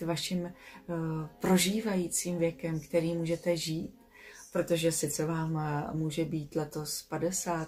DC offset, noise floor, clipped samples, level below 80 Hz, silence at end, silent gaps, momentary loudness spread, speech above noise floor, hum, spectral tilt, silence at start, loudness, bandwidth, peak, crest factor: under 0.1%; -53 dBFS; under 0.1%; -60 dBFS; 0 s; none; 8 LU; 21 dB; none; -4.5 dB/octave; 0 s; -32 LUFS; 16 kHz; -16 dBFS; 18 dB